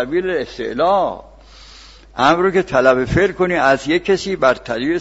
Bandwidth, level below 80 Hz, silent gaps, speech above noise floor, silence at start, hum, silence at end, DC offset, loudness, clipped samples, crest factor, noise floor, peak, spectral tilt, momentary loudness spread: 8 kHz; -40 dBFS; none; 25 dB; 0 s; none; 0 s; under 0.1%; -16 LUFS; under 0.1%; 16 dB; -41 dBFS; 0 dBFS; -5.5 dB/octave; 8 LU